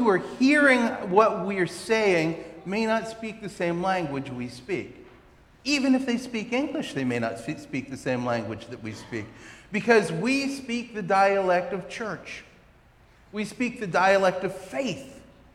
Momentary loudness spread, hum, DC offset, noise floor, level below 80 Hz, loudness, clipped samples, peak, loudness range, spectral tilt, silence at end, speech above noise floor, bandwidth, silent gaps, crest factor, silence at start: 15 LU; none; under 0.1%; -56 dBFS; -60 dBFS; -25 LUFS; under 0.1%; -6 dBFS; 6 LU; -5 dB/octave; 0.3 s; 31 dB; 13 kHz; none; 20 dB; 0 s